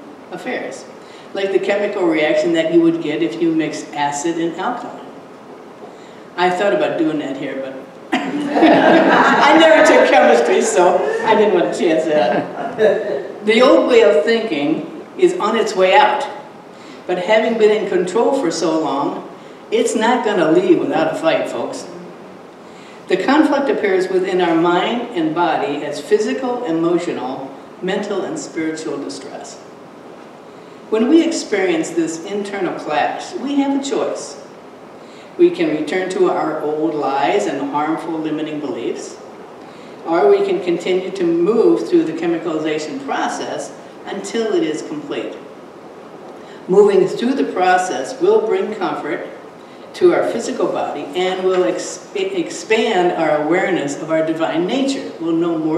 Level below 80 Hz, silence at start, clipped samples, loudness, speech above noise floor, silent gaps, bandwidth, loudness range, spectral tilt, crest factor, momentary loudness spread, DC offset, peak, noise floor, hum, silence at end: -68 dBFS; 0 s; under 0.1%; -16 LUFS; 21 dB; none; 12 kHz; 9 LU; -4.5 dB/octave; 16 dB; 22 LU; under 0.1%; 0 dBFS; -37 dBFS; none; 0 s